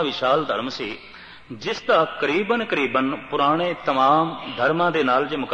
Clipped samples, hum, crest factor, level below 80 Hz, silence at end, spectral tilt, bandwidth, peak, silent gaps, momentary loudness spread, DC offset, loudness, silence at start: under 0.1%; none; 16 dB; -60 dBFS; 0 s; -5.5 dB/octave; 9 kHz; -6 dBFS; none; 12 LU; under 0.1%; -21 LUFS; 0 s